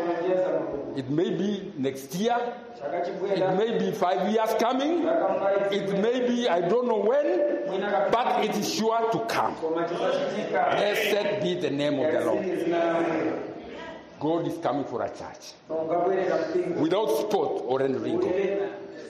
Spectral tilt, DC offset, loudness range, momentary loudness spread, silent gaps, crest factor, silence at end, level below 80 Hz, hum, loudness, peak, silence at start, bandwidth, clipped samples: -5.5 dB/octave; under 0.1%; 4 LU; 8 LU; none; 14 dB; 0 s; -68 dBFS; none; -26 LUFS; -12 dBFS; 0 s; 13 kHz; under 0.1%